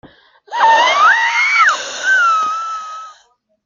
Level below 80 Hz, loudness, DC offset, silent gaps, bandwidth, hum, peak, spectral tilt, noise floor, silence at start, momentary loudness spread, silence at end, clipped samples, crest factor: -66 dBFS; -12 LUFS; under 0.1%; none; 7.6 kHz; none; 0 dBFS; 1.5 dB/octave; -55 dBFS; 0.05 s; 16 LU; 0.55 s; under 0.1%; 14 dB